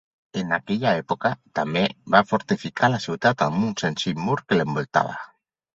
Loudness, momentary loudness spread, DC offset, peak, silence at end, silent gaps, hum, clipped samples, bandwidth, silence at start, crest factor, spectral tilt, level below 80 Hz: -23 LUFS; 8 LU; under 0.1%; -2 dBFS; 0.5 s; none; none; under 0.1%; 8 kHz; 0.35 s; 22 dB; -5.5 dB/octave; -60 dBFS